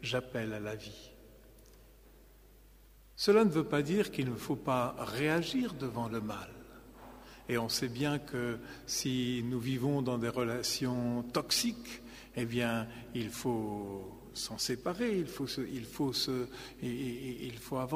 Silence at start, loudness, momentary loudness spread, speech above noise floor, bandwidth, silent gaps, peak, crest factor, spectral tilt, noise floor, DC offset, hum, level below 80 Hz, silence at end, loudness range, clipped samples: 0 s; -35 LUFS; 14 LU; 24 dB; 15.5 kHz; none; -14 dBFS; 22 dB; -4.5 dB/octave; -59 dBFS; under 0.1%; none; -60 dBFS; 0 s; 5 LU; under 0.1%